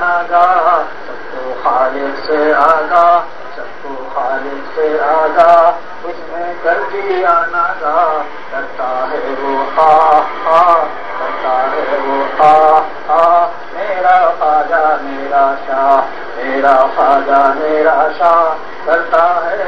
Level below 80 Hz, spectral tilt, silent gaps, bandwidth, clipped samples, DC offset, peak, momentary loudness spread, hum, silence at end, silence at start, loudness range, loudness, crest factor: -54 dBFS; -5 dB/octave; none; 6.4 kHz; 0.3%; 5%; 0 dBFS; 13 LU; none; 0 s; 0 s; 3 LU; -12 LUFS; 12 dB